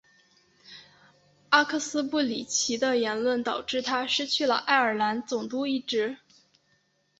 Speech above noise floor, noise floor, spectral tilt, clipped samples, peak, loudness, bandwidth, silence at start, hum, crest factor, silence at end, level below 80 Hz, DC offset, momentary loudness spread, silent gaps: 43 dB; -69 dBFS; -1.5 dB/octave; under 0.1%; -4 dBFS; -26 LUFS; 8.2 kHz; 0.7 s; none; 24 dB; 1.05 s; -72 dBFS; under 0.1%; 8 LU; none